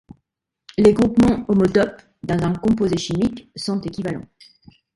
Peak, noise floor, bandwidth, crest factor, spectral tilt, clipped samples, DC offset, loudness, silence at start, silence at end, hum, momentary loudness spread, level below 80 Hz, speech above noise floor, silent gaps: 0 dBFS; -76 dBFS; 11.5 kHz; 20 dB; -7 dB/octave; under 0.1%; under 0.1%; -19 LUFS; 0.8 s; 0.75 s; none; 13 LU; -44 dBFS; 58 dB; none